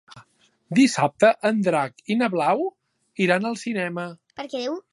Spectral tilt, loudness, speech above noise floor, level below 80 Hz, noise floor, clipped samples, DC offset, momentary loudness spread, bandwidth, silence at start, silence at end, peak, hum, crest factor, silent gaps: -5 dB/octave; -22 LUFS; 37 dB; -74 dBFS; -59 dBFS; under 0.1%; under 0.1%; 14 LU; 11.5 kHz; 0.15 s; 0.15 s; -4 dBFS; none; 20 dB; none